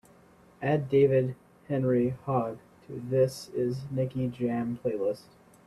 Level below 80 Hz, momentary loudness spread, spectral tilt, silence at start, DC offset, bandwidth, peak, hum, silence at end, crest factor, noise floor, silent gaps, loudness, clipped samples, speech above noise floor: -64 dBFS; 14 LU; -8 dB/octave; 0.6 s; under 0.1%; 13 kHz; -12 dBFS; none; 0.45 s; 16 dB; -57 dBFS; none; -29 LUFS; under 0.1%; 30 dB